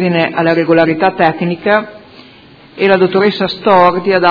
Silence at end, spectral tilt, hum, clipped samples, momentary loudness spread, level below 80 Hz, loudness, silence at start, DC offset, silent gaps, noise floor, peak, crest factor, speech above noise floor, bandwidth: 0 s; -8 dB/octave; none; 0.3%; 6 LU; -52 dBFS; -11 LUFS; 0 s; under 0.1%; none; -40 dBFS; 0 dBFS; 12 dB; 29 dB; 5.4 kHz